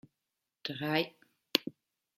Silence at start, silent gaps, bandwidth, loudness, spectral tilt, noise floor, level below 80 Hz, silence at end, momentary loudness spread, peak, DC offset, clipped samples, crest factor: 0.65 s; none; 16 kHz; -34 LUFS; -4 dB/octave; -88 dBFS; -80 dBFS; 0.45 s; 11 LU; -6 dBFS; under 0.1%; under 0.1%; 32 dB